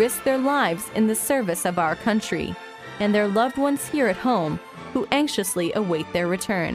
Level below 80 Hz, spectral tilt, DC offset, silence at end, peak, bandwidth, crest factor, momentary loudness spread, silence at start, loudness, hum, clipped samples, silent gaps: -54 dBFS; -4.5 dB/octave; under 0.1%; 0 s; -4 dBFS; 16 kHz; 20 dB; 8 LU; 0 s; -23 LUFS; none; under 0.1%; none